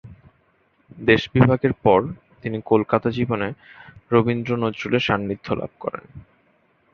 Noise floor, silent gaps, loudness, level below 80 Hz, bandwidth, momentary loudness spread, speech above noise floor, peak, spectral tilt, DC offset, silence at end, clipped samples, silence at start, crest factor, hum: -63 dBFS; none; -21 LUFS; -50 dBFS; 6.8 kHz; 14 LU; 42 dB; -2 dBFS; -8 dB/octave; under 0.1%; 0.75 s; under 0.1%; 0.05 s; 20 dB; none